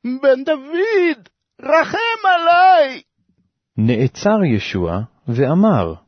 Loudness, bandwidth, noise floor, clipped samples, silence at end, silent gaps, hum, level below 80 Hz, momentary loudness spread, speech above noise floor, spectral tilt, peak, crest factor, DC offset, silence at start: -16 LUFS; 6.6 kHz; -65 dBFS; under 0.1%; 0.1 s; none; none; -48 dBFS; 12 LU; 50 dB; -7 dB/octave; -2 dBFS; 14 dB; under 0.1%; 0.05 s